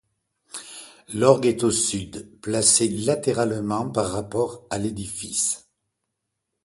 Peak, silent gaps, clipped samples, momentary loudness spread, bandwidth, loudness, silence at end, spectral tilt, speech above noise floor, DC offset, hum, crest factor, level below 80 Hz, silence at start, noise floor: -2 dBFS; none; under 0.1%; 19 LU; 12 kHz; -22 LUFS; 1.05 s; -3.5 dB/octave; 57 dB; under 0.1%; none; 22 dB; -54 dBFS; 0.55 s; -80 dBFS